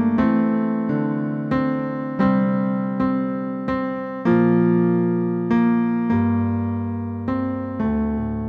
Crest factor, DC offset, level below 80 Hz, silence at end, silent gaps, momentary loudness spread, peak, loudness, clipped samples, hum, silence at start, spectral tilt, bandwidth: 14 dB; under 0.1%; -44 dBFS; 0 s; none; 7 LU; -8 dBFS; -21 LUFS; under 0.1%; none; 0 s; -10.5 dB/octave; 4.6 kHz